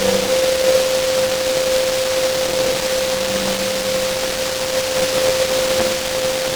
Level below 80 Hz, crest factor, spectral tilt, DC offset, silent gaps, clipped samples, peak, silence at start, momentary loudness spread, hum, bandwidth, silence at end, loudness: -44 dBFS; 16 dB; -2 dB/octave; under 0.1%; none; under 0.1%; -2 dBFS; 0 s; 4 LU; none; over 20 kHz; 0 s; -17 LUFS